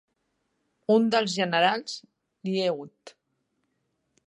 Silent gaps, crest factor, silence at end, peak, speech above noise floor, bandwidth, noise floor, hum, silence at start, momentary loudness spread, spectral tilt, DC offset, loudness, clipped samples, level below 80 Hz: none; 22 dB; 1.15 s; -8 dBFS; 51 dB; 10.5 kHz; -76 dBFS; none; 0.9 s; 16 LU; -4.5 dB/octave; under 0.1%; -25 LUFS; under 0.1%; -80 dBFS